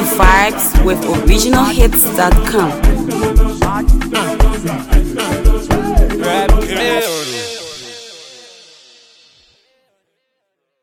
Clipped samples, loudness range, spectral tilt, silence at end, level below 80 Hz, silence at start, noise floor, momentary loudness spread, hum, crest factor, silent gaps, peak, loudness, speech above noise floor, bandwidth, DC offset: under 0.1%; 10 LU; -4.5 dB/octave; 2.55 s; -16 dBFS; 0 s; -70 dBFS; 13 LU; none; 12 dB; none; 0 dBFS; -13 LUFS; 59 dB; 19.5 kHz; under 0.1%